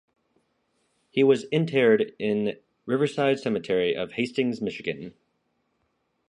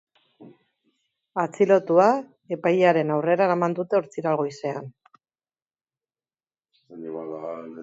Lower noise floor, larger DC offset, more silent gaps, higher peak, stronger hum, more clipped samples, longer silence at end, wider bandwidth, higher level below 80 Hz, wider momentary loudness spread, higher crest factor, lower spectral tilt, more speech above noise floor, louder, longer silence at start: second, -74 dBFS vs under -90 dBFS; neither; neither; about the same, -8 dBFS vs -6 dBFS; neither; neither; first, 1.2 s vs 0 s; first, 10.5 kHz vs 8 kHz; first, -68 dBFS vs -76 dBFS; second, 11 LU vs 16 LU; about the same, 18 dB vs 20 dB; about the same, -6.5 dB/octave vs -7 dB/octave; second, 49 dB vs over 69 dB; about the same, -25 LUFS vs -23 LUFS; first, 1.15 s vs 0.4 s